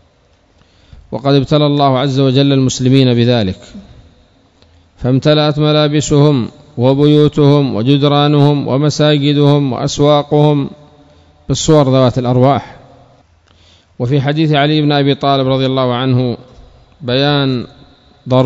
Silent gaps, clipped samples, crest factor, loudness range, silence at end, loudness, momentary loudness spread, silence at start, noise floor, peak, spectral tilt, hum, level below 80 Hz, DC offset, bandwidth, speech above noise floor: none; 0.5%; 12 dB; 4 LU; 0 s; -12 LUFS; 9 LU; 1.1 s; -52 dBFS; 0 dBFS; -6.5 dB/octave; none; -42 dBFS; under 0.1%; 7.8 kHz; 41 dB